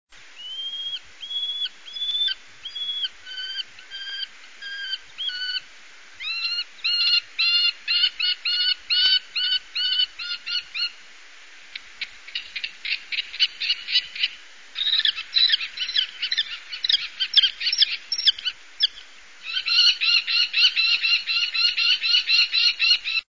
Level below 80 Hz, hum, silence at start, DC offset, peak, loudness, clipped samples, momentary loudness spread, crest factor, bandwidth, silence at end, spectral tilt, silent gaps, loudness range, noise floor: -68 dBFS; none; 0.2 s; 0.4%; -6 dBFS; -21 LUFS; under 0.1%; 15 LU; 18 dB; 7.6 kHz; 0.15 s; 3.5 dB/octave; none; 11 LU; -47 dBFS